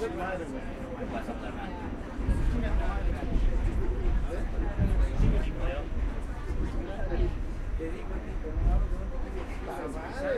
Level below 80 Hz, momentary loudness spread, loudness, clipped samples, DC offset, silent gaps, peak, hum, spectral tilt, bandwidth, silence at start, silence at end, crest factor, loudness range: -30 dBFS; 8 LU; -33 LUFS; under 0.1%; under 0.1%; none; -14 dBFS; none; -7.5 dB/octave; 9.8 kHz; 0 s; 0 s; 14 dB; 3 LU